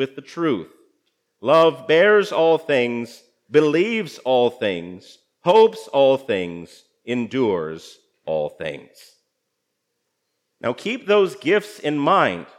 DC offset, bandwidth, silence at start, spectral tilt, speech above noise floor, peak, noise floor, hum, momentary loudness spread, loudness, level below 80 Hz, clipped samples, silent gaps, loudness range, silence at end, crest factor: under 0.1%; 13 kHz; 0 s; -5.5 dB/octave; 57 dB; -2 dBFS; -76 dBFS; none; 16 LU; -19 LUFS; -72 dBFS; under 0.1%; none; 10 LU; 0.15 s; 18 dB